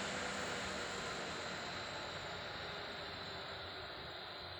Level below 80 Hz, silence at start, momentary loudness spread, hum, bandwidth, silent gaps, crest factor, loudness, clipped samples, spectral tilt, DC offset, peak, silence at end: -66 dBFS; 0 s; 6 LU; none; over 20 kHz; none; 14 dB; -43 LUFS; under 0.1%; -2.5 dB/octave; under 0.1%; -30 dBFS; 0 s